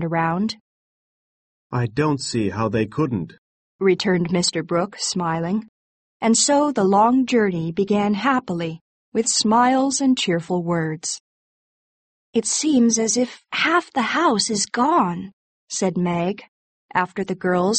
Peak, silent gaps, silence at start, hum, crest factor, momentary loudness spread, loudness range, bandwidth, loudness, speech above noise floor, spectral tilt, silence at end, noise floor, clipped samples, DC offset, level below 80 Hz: -4 dBFS; 0.60-1.70 s, 3.38-3.79 s, 5.69-6.20 s, 8.81-9.12 s, 11.20-12.33 s, 15.33-15.67 s, 16.48-16.89 s; 0 s; none; 16 dB; 11 LU; 4 LU; 8.8 kHz; -20 LUFS; over 70 dB; -4 dB/octave; 0 s; under -90 dBFS; under 0.1%; under 0.1%; -58 dBFS